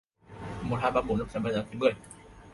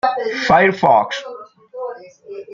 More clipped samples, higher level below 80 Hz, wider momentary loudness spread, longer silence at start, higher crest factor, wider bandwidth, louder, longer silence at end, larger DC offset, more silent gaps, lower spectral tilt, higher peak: neither; about the same, -50 dBFS vs -54 dBFS; second, 17 LU vs 24 LU; first, 0.3 s vs 0.05 s; about the same, 20 dB vs 16 dB; first, 11.5 kHz vs 7.4 kHz; second, -30 LUFS vs -15 LUFS; about the same, 0 s vs 0 s; neither; neither; first, -6.5 dB/octave vs -5 dB/octave; second, -12 dBFS vs -2 dBFS